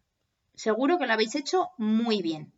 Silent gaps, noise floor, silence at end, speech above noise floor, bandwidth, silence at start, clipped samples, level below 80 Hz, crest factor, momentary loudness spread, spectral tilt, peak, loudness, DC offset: none; -78 dBFS; 0.15 s; 51 dB; 8 kHz; 0.6 s; under 0.1%; -80 dBFS; 16 dB; 5 LU; -4.5 dB/octave; -12 dBFS; -27 LUFS; under 0.1%